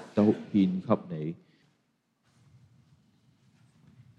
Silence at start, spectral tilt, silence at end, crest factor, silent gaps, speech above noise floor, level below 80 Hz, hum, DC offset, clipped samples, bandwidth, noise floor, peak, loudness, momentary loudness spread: 0 s; -9.5 dB/octave; 2.85 s; 22 dB; none; 45 dB; -74 dBFS; none; under 0.1%; under 0.1%; 6.8 kHz; -74 dBFS; -10 dBFS; -28 LUFS; 13 LU